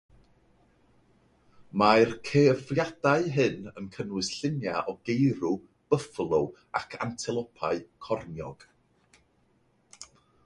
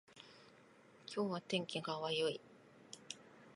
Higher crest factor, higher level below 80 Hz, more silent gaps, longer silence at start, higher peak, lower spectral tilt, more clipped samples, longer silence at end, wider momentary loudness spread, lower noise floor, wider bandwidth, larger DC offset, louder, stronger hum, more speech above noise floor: about the same, 24 dB vs 22 dB; first, -62 dBFS vs -88 dBFS; neither; first, 1.6 s vs 0.1 s; first, -6 dBFS vs -22 dBFS; first, -6 dB/octave vs -4 dB/octave; neither; first, 0.4 s vs 0 s; second, 17 LU vs 24 LU; about the same, -68 dBFS vs -65 dBFS; about the same, 11.5 kHz vs 11.5 kHz; neither; first, -28 LUFS vs -42 LUFS; neither; first, 40 dB vs 25 dB